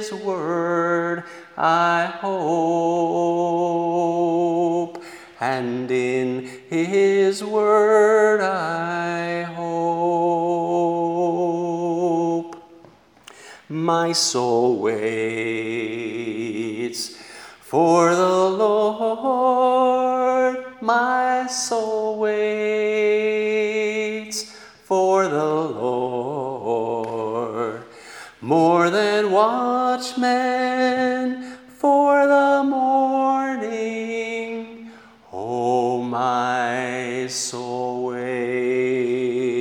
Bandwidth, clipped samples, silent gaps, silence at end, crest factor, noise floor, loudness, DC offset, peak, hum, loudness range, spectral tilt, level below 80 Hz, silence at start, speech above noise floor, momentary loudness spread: 19.5 kHz; under 0.1%; none; 0 s; 18 dB; -50 dBFS; -21 LUFS; under 0.1%; -2 dBFS; none; 5 LU; -4.5 dB/octave; -72 dBFS; 0 s; 31 dB; 10 LU